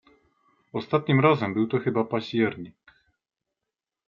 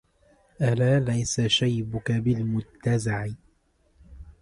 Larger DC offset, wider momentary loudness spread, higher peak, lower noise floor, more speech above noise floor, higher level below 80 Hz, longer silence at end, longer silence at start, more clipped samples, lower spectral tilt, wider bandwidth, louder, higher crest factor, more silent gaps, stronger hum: neither; first, 15 LU vs 7 LU; first, -6 dBFS vs -10 dBFS; first, -87 dBFS vs -65 dBFS; first, 63 dB vs 40 dB; second, -68 dBFS vs -50 dBFS; first, 1.4 s vs 0.1 s; first, 0.75 s vs 0.6 s; neither; first, -8.5 dB/octave vs -5.5 dB/octave; second, 7 kHz vs 11.5 kHz; about the same, -25 LUFS vs -25 LUFS; first, 22 dB vs 16 dB; neither; neither